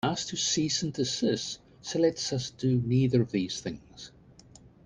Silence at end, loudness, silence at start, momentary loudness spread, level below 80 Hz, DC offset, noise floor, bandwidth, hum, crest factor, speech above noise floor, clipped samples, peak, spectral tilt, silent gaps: 0.2 s; -28 LUFS; 0.05 s; 14 LU; -60 dBFS; under 0.1%; -54 dBFS; 10 kHz; none; 18 dB; 26 dB; under 0.1%; -12 dBFS; -4.5 dB/octave; none